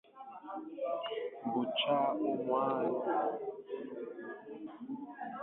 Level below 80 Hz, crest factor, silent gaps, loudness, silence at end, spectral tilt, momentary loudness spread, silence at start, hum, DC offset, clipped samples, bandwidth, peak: -84 dBFS; 16 dB; none; -36 LUFS; 0 s; -2.5 dB/octave; 15 LU; 0.15 s; none; under 0.1%; under 0.1%; 4.1 kHz; -20 dBFS